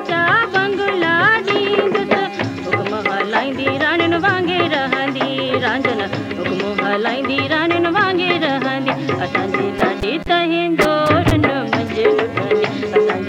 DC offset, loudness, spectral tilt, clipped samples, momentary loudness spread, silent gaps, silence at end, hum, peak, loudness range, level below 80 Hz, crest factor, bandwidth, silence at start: under 0.1%; -17 LUFS; -6 dB/octave; under 0.1%; 6 LU; none; 0 s; none; 0 dBFS; 2 LU; -42 dBFS; 16 dB; 16 kHz; 0 s